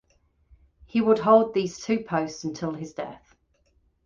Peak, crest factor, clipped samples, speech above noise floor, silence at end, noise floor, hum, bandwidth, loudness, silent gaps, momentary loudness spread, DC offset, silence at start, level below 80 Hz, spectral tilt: -6 dBFS; 20 dB; under 0.1%; 43 dB; 0.9 s; -67 dBFS; none; 7.6 kHz; -24 LUFS; none; 16 LU; under 0.1%; 0.95 s; -60 dBFS; -6 dB/octave